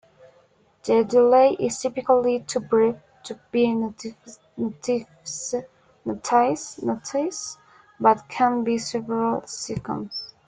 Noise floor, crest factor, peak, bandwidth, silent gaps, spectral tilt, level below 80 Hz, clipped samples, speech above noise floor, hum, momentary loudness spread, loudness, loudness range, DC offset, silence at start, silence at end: -59 dBFS; 20 dB; -4 dBFS; 9.4 kHz; none; -4.5 dB/octave; -62 dBFS; under 0.1%; 37 dB; none; 16 LU; -23 LUFS; 6 LU; under 0.1%; 0.85 s; 0.2 s